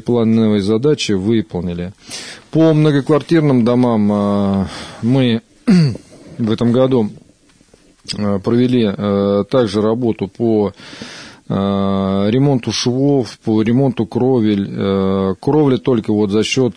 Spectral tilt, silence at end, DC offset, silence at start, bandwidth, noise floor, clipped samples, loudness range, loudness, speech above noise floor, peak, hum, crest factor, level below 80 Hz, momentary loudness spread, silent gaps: -7 dB/octave; 0.05 s; under 0.1%; 0.05 s; 10.5 kHz; -50 dBFS; under 0.1%; 3 LU; -15 LUFS; 36 dB; -2 dBFS; none; 12 dB; -50 dBFS; 10 LU; none